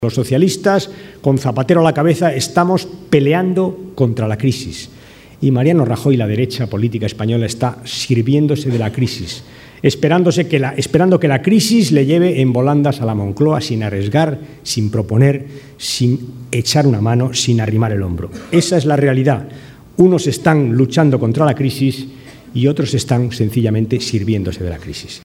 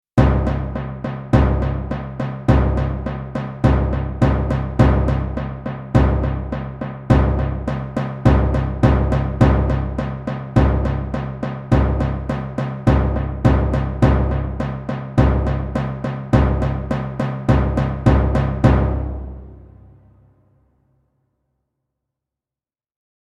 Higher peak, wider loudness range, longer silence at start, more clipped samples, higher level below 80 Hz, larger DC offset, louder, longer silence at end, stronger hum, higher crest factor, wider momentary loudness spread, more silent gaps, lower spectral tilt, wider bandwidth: about the same, 0 dBFS vs 0 dBFS; about the same, 4 LU vs 2 LU; second, 0 s vs 0.15 s; neither; second, -46 dBFS vs -24 dBFS; neither; first, -15 LUFS vs -19 LUFS; second, 0.05 s vs 3.65 s; neither; about the same, 14 dB vs 18 dB; about the same, 10 LU vs 10 LU; neither; second, -6 dB/octave vs -9 dB/octave; first, 16 kHz vs 7.4 kHz